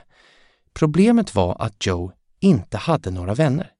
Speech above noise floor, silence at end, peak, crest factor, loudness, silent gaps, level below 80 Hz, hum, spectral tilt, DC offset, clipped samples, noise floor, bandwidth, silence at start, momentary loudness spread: 37 dB; 0.15 s; -2 dBFS; 18 dB; -20 LUFS; none; -46 dBFS; none; -7 dB/octave; under 0.1%; under 0.1%; -56 dBFS; 11 kHz; 0.75 s; 8 LU